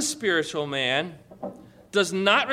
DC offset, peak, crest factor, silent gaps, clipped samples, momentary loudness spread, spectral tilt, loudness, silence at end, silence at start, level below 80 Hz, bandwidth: under 0.1%; -6 dBFS; 20 dB; none; under 0.1%; 18 LU; -2.5 dB/octave; -24 LUFS; 0 s; 0 s; -66 dBFS; 15.5 kHz